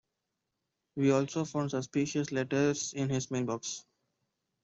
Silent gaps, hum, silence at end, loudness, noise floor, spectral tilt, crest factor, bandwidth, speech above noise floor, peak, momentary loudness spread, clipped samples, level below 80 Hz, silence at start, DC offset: none; none; 0.85 s; -32 LUFS; -85 dBFS; -5 dB/octave; 18 dB; 8.2 kHz; 54 dB; -14 dBFS; 8 LU; under 0.1%; -70 dBFS; 0.95 s; under 0.1%